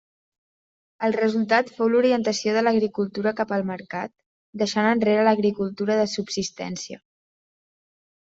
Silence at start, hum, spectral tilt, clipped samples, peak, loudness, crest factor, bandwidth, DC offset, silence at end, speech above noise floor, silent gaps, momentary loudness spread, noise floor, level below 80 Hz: 1 s; none; -5 dB/octave; under 0.1%; -4 dBFS; -23 LUFS; 20 dB; 8 kHz; under 0.1%; 1.3 s; over 68 dB; 4.26-4.53 s; 13 LU; under -90 dBFS; -66 dBFS